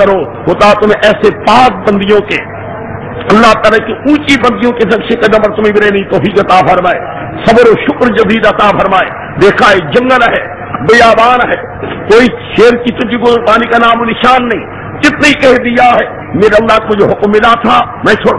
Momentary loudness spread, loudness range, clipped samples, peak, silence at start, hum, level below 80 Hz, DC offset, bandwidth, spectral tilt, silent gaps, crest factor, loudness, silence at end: 10 LU; 2 LU; 8%; 0 dBFS; 0 s; none; -34 dBFS; under 0.1%; 11 kHz; -5.5 dB/octave; none; 8 dB; -7 LUFS; 0 s